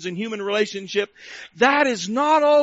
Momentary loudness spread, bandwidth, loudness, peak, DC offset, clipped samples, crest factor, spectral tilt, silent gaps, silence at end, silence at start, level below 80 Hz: 14 LU; 8 kHz; -20 LUFS; -4 dBFS; under 0.1%; under 0.1%; 16 dB; -2 dB/octave; none; 0 s; 0 s; -66 dBFS